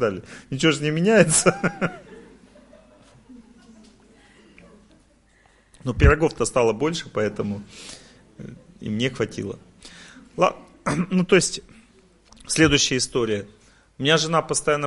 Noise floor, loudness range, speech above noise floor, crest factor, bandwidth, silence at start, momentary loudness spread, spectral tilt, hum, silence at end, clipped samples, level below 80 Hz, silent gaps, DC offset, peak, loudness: -58 dBFS; 8 LU; 36 dB; 22 dB; 11.5 kHz; 0 s; 23 LU; -4 dB/octave; none; 0 s; under 0.1%; -36 dBFS; none; under 0.1%; -2 dBFS; -21 LUFS